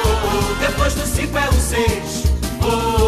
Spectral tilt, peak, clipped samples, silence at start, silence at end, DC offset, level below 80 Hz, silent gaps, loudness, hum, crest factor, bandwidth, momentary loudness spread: -4.5 dB/octave; -4 dBFS; under 0.1%; 0 s; 0 s; under 0.1%; -22 dBFS; none; -18 LUFS; none; 14 dB; 14 kHz; 3 LU